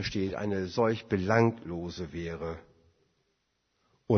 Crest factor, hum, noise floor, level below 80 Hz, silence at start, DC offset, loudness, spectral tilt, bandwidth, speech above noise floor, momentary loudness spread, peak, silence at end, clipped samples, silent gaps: 22 dB; none; -77 dBFS; -56 dBFS; 0 s; under 0.1%; -31 LUFS; -7 dB/octave; 6.6 kHz; 47 dB; 12 LU; -10 dBFS; 0 s; under 0.1%; none